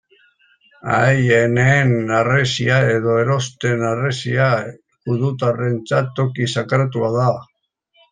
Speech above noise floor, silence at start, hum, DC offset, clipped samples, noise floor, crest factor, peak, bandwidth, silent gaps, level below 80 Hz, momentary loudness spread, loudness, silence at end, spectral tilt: 46 dB; 0.85 s; none; under 0.1%; under 0.1%; -63 dBFS; 16 dB; -2 dBFS; 9.4 kHz; none; -54 dBFS; 8 LU; -17 LUFS; 0.7 s; -6 dB/octave